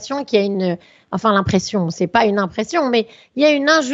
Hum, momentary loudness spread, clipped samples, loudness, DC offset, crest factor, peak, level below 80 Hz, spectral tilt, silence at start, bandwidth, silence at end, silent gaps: none; 8 LU; under 0.1%; -17 LUFS; under 0.1%; 16 dB; 0 dBFS; -48 dBFS; -5 dB/octave; 0 s; 8 kHz; 0 s; none